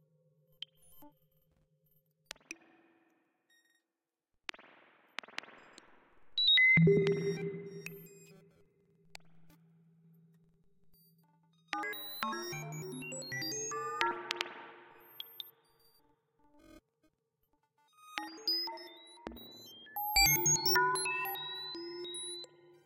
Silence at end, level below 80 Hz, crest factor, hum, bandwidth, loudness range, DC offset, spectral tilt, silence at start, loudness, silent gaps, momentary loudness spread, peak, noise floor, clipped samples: 0.4 s; -62 dBFS; 28 dB; none; 16 kHz; 24 LU; under 0.1%; -2.5 dB/octave; 0.9 s; -31 LUFS; none; 25 LU; -10 dBFS; under -90 dBFS; under 0.1%